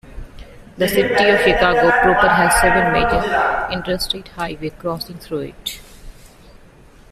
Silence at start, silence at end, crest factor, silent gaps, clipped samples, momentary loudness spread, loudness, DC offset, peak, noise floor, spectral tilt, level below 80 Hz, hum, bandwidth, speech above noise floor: 0.05 s; 0.85 s; 16 dB; none; under 0.1%; 14 LU; -16 LUFS; under 0.1%; -2 dBFS; -45 dBFS; -4 dB/octave; -34 dBFS; none; 16 kHz; 28 dB